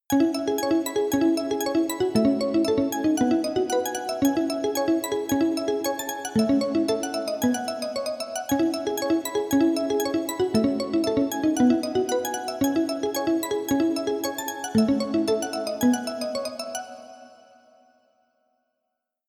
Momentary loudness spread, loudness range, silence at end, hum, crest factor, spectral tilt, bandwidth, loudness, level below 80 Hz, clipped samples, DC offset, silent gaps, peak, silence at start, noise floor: 7 LU; 3 LU; 2 s; none; 16 dB; -4.5 dB/octave; over 20 kHz; -24 LUFS; -60 dBFS; under 0.1%; under 0.1%; none; -10 dBFS; 0.1 s; -81 dBFS